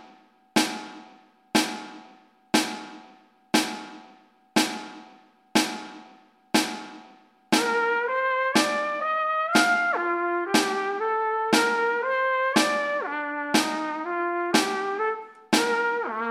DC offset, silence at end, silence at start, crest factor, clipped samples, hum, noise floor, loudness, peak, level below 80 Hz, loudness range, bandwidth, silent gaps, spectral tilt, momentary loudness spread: under 0.1%; 0 s; 0 s; 22 dB; under 0.1%; none; -56 dBFS; -24 LUFS; -4 dBFS; -76 dBFS; 5 LU; 16 kHz; none; -2.5 dB/octave; 14 LU